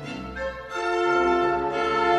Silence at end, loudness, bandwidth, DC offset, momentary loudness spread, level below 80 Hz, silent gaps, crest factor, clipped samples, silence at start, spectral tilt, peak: 0 s; -24 LUFS; 9.6 kHz; under 0.1%; 11 LU; -48 dBFS; none; 14 dB; under 0.1%; 0 s; -5 dB/octave; -10 dBFS